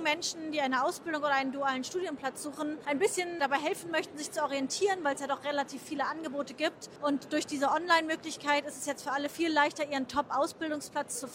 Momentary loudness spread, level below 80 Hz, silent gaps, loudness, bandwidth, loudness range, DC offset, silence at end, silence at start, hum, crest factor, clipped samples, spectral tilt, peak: 8 LU; -74 dBFS; none; -32 LUFS; 16 kHz; 3 LU; under 0.1%; 0 s; 0 s; none; 20 dB; under 0.1%; -2.5 dB/octave; -12 dBFS